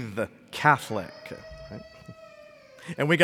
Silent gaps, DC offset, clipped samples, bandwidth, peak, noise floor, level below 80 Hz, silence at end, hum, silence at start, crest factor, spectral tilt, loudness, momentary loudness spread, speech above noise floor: none; under 0.1%; under 0.1%; 17.5 kHz; -4 dBFS; -50 dBFS; -60 dBFS; 0 s; none; 0 s; 26 dB; -5.5 dB/octave; -26 LUFS; 25 LU; 25 dB